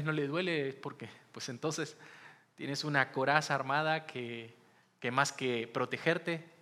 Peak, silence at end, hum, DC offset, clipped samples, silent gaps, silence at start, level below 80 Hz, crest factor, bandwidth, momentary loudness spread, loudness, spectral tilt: -10 dBFS; 0.15 s; none; under 0.1%; under 0.1%; none; 0 s; -90 dBFS; 24 dB; 14.5 kHz; 16 LU; -34 LUFS; -4.5 dB/octave